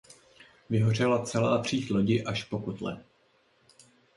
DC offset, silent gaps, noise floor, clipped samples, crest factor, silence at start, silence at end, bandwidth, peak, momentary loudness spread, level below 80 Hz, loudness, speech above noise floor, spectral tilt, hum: under 0.1%; none; -67 dBFS; under 0.1%; 18 dB; 0.7 s; 1.15 s; 11.5 kHz; -12 dBFS; 11 LU; -60 dBFS; -28 LUFS; 39 dB; -6 dB/octave; none